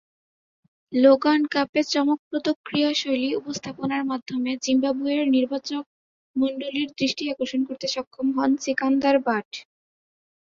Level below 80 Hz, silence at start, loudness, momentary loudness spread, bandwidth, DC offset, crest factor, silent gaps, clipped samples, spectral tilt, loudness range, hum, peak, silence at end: -66 dBFS; 0.9 s; -23 LUFS; 9 LU; 7.6 kHz; under 0.1%; 18 dB; 1.69-1.73 s, 2.19-2.31 s, 2.56-2.64 s, 5.86-6.34 s, 8.07-8.11 s, 9.45-9.51 s; under 0.1%; -4 dB/octave; 4 LU; none; -6 dBFS; 0.9 s